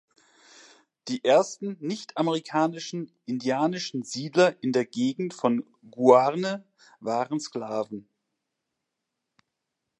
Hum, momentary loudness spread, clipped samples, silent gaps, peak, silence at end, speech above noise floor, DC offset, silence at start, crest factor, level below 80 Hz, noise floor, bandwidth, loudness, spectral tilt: none; 14 LU; under 0.1%; none; -4 dBFS; 2 s; 58 dB; under 0.1%; 1.05 s; 22 dB; -80 dBFS; -83 dBFS; 10.5 kHz; -26 LUFS; -5 dB/octave